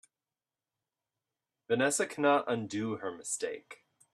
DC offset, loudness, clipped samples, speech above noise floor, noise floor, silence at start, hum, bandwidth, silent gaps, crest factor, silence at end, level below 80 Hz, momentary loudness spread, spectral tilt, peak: under 0.1%; -32 LUFS; under 0.1%; over 58 dB; under -90 dBFS; 1.7 s; none; 14 kHz; none; 20 dB; 0.4 s; -78 dBFS; 10 LU; -3.5 dB/octave; -14 dBFS